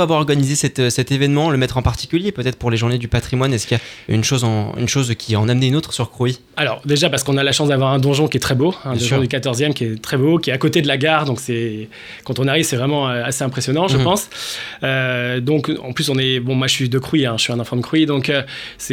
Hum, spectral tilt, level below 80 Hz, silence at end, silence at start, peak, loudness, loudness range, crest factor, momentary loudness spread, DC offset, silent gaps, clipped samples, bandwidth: none; -5 dB/octave; -42 dBFS; 0 s; 0 s; 0 dBFS; -17 LUFS; 2 LU; 18 dB; 6 LU; under 0.1%; none; under 0.1%; 16.5 kHz